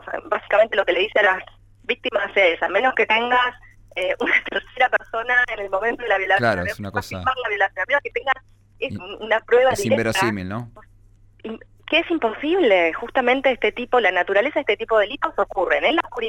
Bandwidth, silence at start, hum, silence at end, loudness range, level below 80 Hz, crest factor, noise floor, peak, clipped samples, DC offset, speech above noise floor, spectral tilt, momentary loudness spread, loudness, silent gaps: 16 kHz; 0.05 s; none; 0 s; 3 LU; -50 dBFS; 16 dB; -51 dBFS; -6 dBFS; under 0.1%; under 0.1%; 31 dB; -4.5 dB/octave; 11 LU; -20 LUFS; none